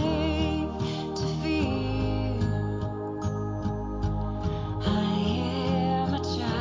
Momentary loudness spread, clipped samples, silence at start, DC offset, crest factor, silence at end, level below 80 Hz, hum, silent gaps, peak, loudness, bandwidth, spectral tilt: 5 LU; under 0.1%; 0 s; under 0.1%; 14 dB; 0 s; -38 dBFS; none; none; -12 dBFS; -29 LUFS; 7.6 kHz; -7 dB/octave